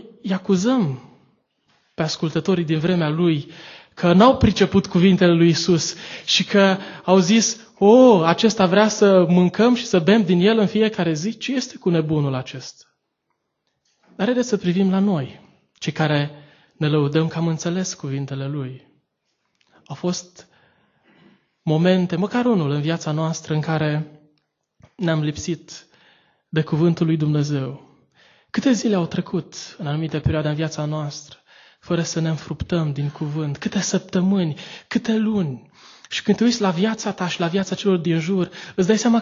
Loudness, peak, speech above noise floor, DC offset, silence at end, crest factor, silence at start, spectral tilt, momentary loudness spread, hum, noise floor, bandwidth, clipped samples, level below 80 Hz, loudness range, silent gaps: -20 LUFS; 0 dBFS; 55 dB; under 0.1%; 0 s; 20 dB; 0.05 s; -5.5 dB/octave; 13 LU; none; -75 dBFS; 7.6 kHz; under 0.1%; -48 dBFS; 10 LU; none